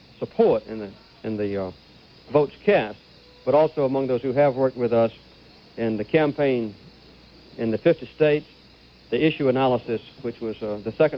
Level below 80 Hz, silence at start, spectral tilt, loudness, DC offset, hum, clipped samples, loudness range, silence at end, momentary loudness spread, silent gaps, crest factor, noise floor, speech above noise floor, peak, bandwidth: -58 dBFS; 0.2 s; -9 dB/octave; -23 LUFS; under 0.1%; none; under 0.1%; 3 LU; 0 s; 13 LU; none; 18 dB; -51 dBFS; 29 dB; -6 dBFS; 6 kHz